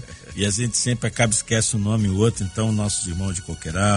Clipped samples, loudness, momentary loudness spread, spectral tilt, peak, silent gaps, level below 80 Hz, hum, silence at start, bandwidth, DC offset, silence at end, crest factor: under 0.1%; -22 LUFS; 8 LU; -4 dB/octave; -4 dBFS; none; -42 dBFS; none; 0 s; 11 kHz; under 0.1%; 0 s; 18 dB